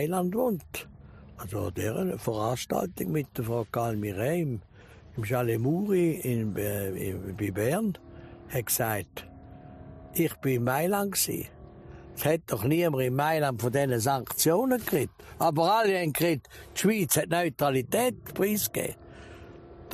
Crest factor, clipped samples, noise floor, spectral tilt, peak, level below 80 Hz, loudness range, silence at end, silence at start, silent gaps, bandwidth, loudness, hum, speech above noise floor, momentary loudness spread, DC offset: 16 dB; under 0.1%; -48 dBFS; -5 dB/octave; -12 dBFS; -56 dBFS; 5 LU; 0 s; 0 s; none; 15.5 kHz; -28 LUFS; none; 21 dB; 18 LU; under 0.1%